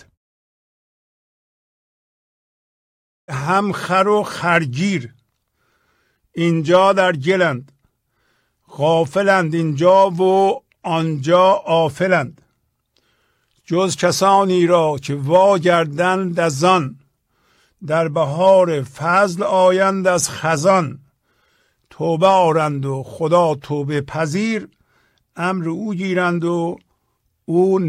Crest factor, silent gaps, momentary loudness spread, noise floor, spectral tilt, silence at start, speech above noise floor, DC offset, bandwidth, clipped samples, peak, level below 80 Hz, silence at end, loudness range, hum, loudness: 16 dB; none; 10 LU; -68 dBFS; -5.5 dB/octave; 3.3 s; 52 dB; under 0.1%; 14.5 kHz; under 0.1%; -2 dBFS; -60 dBFS; 0 s; 6 LU; none; -17 LUFS